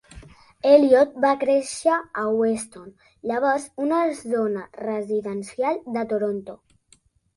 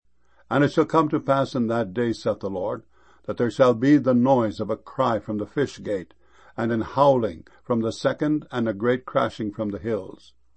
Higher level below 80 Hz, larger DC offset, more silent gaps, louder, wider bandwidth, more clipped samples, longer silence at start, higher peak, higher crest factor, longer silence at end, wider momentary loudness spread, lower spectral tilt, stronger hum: about the same, -60 dBFS vs -58 dBFS; second, under 0.1% vs 0.2%; neither; about the same, -22 LUFS vs -23 LUFS; first, 11.5 kHz vs 8.6 kHz; neither; second, 0.15 s vs 0.5 s; about the same, -4 dBFS vs -4 dBFS; about the same, 20 dB vs 20 dB; first, 0.8 s vs 0.45 s; about the same, 13 LU vs 11 LU; second, -5 dB/octave vs -7.5 dB/octave; neither